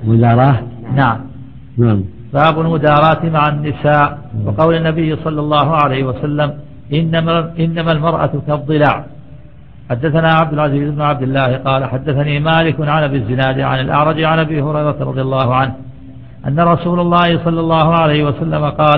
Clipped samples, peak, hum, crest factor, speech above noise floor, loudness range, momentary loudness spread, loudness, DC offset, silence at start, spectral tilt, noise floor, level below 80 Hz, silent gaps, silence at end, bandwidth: under 0.1%; 0 dBFS; none; 14 dB; 25 dB; 2 LU; 8 LU; -14 LUFS; 1%; 0 s; -10 dB/octave; -38 dBFS; -38 dBFS; none; 0 s; 4.6 kHz